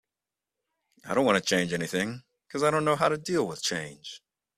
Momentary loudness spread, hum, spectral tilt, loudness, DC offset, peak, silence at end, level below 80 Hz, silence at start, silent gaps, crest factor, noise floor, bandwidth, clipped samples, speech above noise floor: 18 LU; none; -4 dB/octave; -27 LUFS; under 0.1%; -6 dBFS; 0.4 s; -66 dBFS; 1.05 s; none; 22 dB; -89 dBFS; 15 kHz; under 0.1%; 62 dB